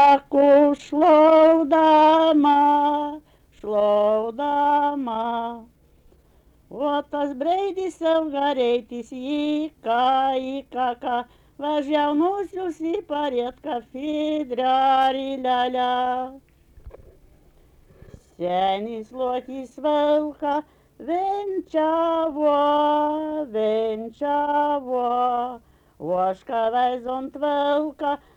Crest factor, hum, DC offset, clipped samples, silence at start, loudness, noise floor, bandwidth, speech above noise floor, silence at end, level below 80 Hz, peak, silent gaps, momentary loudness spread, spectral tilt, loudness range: 16 dB; none; under 0.1%; under 0.1%; 0 s; -22 LUFS; -56 dBFS; 8.6 kHz; 34 dB; 0.2 s; -58 dBFS; -6 dBFS; none; 13 LU; -5.5 dB/octave; 9 LU